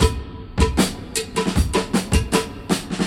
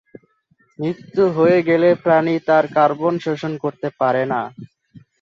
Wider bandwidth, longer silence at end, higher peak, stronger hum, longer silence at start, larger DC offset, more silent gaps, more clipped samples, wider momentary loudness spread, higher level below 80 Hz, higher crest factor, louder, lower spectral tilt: first, 16.5 kHz vs 7.2 kHz; second, 0 s vs 0.55 s; about the same, -2 dBFS vs -2 dBFS; neither; second, 0 s vs 0.8 s; neither; neither; neither; second, 6 LU vs 11 LU; first, -26 dBFS vs -64 dBFS; about the same, 20 dB vs 16 dB; second, -21 LUFS vs -18 LUFS; second, -4.5 dB/octave vs -8 dB/octave